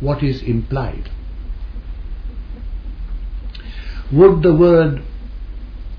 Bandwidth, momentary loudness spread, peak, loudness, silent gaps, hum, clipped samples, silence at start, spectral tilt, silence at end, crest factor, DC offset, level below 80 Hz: 5.4 kHz; 22 LU; 0 dBFS; -14 LUFS; none; none; under 0.1%; 0 s; -10.5 dB/octave; 0 s; 18 dB; under 0.1%; -26 dBFS